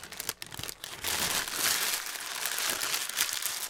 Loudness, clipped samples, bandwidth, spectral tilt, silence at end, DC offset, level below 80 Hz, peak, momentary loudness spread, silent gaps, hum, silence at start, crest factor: -30 LUFS; under 0.1%; 19 kHz; 0.5 dB/octave; 0 s; under 0.1%; -62 dBFS; -8 dBFS; 11 LU; none; none; 0 s; 26 dB